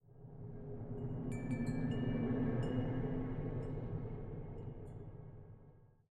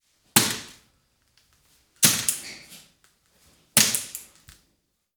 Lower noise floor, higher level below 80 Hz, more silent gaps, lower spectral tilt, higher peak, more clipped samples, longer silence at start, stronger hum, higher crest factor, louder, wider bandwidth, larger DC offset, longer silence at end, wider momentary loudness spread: second, -62 dBFS vs -72 dBFS; first, -50 dBFS vs -64 dBFS; neither; first, -9 dB/octave vs -1 dB/octave; second, -24 dBFS vs 0 dBFS; neither; second, 0.05 s vs 0.35 s; neither; second, 16 dB vs 28 dB; second, -42 LUFS vs -21 LUFS; second, 10 kHz vs over 20 kHz; neither; second, 0.25 s vs 0.95 s; second, 16 LU vs 21 LU